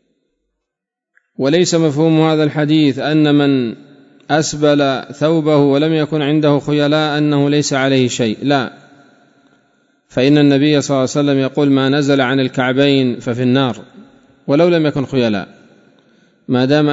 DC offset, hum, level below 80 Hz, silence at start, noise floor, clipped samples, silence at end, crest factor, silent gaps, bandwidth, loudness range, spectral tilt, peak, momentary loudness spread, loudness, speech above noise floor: under 0.1%; none; -56 dBFS; 1.4 s; -81 dBFS; under 0.1%; 0 s; 14 dB; none; 8 kHz; 3 LU; -6 dB/octave; 0 dBFS; 6 LU; -14 LUFS; 68 dB